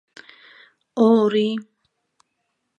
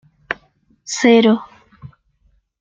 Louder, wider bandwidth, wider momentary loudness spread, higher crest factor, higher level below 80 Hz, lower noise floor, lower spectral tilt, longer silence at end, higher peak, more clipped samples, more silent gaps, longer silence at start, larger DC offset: second, -19 LUFS vs -16 LUFS; about the same, 7.4 kHz vs 8 kHz; about the same, 16 LU vs 17 LU; about the same, 18 dB vs 18 dB; second, -76 dBFS vs -60 dBFS; first, -75 dBFS vs -60 dBFS; first, -7 dB/octave vs -4 dB/octave; first, 1.2 s vs 0.75 s; about the same, -4 dBFS vs -2 dBFS; neither; neither; first, 0.95 s vs 0.3 s; neither